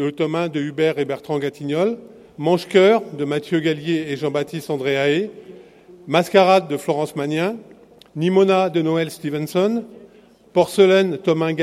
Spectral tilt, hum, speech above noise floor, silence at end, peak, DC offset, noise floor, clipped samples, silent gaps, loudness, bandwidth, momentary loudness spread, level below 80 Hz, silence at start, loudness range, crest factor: -6 dB/octave; none; 31 dB; 0 s; 0 dBFS; under 0.1%; -49 dBFS; under 0.1%; none; -19 LUFS; 15 kHz; 10 LU; -66 dBFS; 0 s; 2 LU; 20 dB